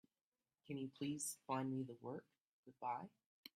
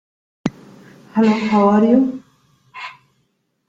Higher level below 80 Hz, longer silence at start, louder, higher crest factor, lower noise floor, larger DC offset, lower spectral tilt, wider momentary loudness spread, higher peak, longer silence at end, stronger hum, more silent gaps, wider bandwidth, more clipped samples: second, -88 dBFS vs -58 dBFS; first, 0.65 s vs 0.45 s; second, -47 LUFS vs -16 LUFS; about the same, 20 dB vs 18 dB; first, under -90 dBFS vs -67 dBFS; neither; second, -4.5 dB/octave vs -7.5 dB/octave; second, 11 LU vs 20 LU; second, -30 dBFS vs -2 dBFS; second, 0.1 s vs 0.8 s; neither; first, 2.40-2.63 s, 3.26-3.43 s vs none; first, 15 kHz vs 7.6 kHz; neither